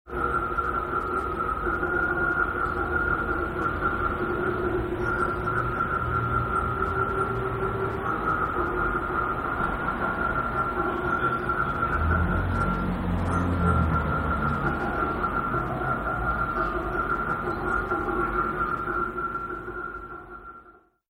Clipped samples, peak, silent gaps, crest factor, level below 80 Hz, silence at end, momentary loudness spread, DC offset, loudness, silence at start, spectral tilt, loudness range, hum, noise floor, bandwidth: under 0.1%; -12 dBFS; none; 16 dB; -36 dBFS; 0.4 s; 4 LU; under 0.1%; -26 LUFS; 0.05 s; -8 dB/octave; 2 LU; none; -54 dBFS; 16 kHz